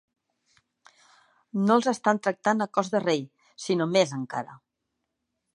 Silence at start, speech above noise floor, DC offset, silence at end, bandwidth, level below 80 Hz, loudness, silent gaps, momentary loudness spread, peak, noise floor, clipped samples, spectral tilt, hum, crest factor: 1.55 s; 56 dB; under 0.1%; 1 s; 11 kHz; -80 dBFS; -26 LUFS; none; 13 LU; -8 dBFS; -81 dBFS; under 0.1%; -5 dB/octave; none; 20 dB